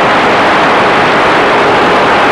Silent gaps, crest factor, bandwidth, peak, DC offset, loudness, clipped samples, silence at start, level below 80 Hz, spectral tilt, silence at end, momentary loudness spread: none; 6 dB; 13 kHz; -2 dBFS; under 0.1%; -7 LUFS; under 0.1%; 0 s; -38 dBFS; -4.5 dB/octave; 0 s; 0 LU